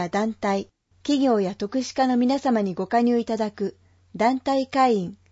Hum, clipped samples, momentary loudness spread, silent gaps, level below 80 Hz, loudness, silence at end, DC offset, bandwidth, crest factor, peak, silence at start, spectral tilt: none; under 0.1%; 9 LU; none; -62 dBFS; -23 LUFS; 0.15 s; under 0.1%; 8 kHz; 16 dB; -8 dBFS; 0 s; -5.5 dB/octave